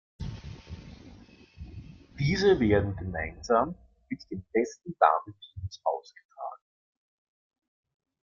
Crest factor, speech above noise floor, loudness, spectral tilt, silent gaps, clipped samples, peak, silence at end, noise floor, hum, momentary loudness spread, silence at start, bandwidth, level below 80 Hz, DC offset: 26 dB; 25 dB; -28 LUFS; -6.5 dB/octave; 6.25-6.29 s; under 0.1%; -6 dBFS; 1.75 s; -53 dBFS; none; 22 LU; 0.2 s; 7.4 kHz; -50 dBFS; under 0.1%